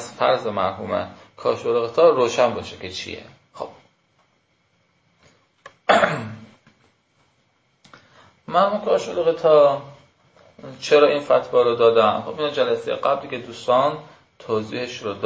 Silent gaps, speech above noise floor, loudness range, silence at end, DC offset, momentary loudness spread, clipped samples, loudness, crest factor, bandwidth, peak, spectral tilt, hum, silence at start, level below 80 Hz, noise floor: none; 45 dB; 7 LU; 0 s; under 0.1%; 18 LU; under 0.1%; -20 LUFS; 20 dB; 8 kHz; -2 dBFS; -4.5 dB/octave; none; 0 s; -60 dBFS; -65 dBFS